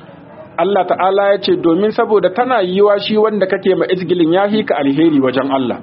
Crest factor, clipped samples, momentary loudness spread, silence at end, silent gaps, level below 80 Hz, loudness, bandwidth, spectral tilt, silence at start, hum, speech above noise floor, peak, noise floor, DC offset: 14 dB; under 0.1%; 3 LU; 0 s; none; -58 dBFS; -14 LUFS; 5.8 kHz; -4.5 dB/octave; 0 s; none; 23 dB; 0 dBFS; -36 dBFS; under 0.1%